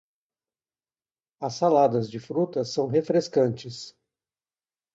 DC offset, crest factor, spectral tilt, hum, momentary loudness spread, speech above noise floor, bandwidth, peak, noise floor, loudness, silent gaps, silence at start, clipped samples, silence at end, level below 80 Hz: under 0.1%; 18 dB; -6.5 dB/octave; none; 16 LU; over 66 dB; 8 kHz; -8 dBFS; under -90 dBFS; -25 LUFS; none; 1.4 s; under 0.1%; 1.05 s; -70 dBFS